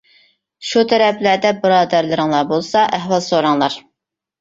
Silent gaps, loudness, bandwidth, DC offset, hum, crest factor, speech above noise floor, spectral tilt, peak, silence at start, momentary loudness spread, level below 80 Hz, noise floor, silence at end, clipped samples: none; -15 LUFS; 8 kHz; under 0.1%; none; 14 dB; 65 dB; -4.5 dB/octave; -2 dBFS; 0.6 s; 5 LU; -60 dBFS; -80 dBFS; 0.6 s; under 0.1%